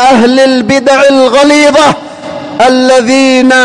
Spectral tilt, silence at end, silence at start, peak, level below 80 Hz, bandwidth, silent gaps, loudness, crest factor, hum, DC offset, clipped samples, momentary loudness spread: -3.5 dB/octave; 0 s; 0 s; 0 dBFS; -42 dBFS; 10.5 kHz; none; -5 LUFS; 6 dB; none; 0.6%; 1%; 12 LU